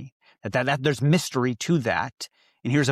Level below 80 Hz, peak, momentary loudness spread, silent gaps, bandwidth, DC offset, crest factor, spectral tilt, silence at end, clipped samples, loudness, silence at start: -60 dBFS; -8 dBFS; 15 LU; 0.12-0.20 s; 14.5 kHz; under 0.1%; 16 dB; -5.5 dB/octave; 0 s; under 0.1%; -24 LUFS; 0 s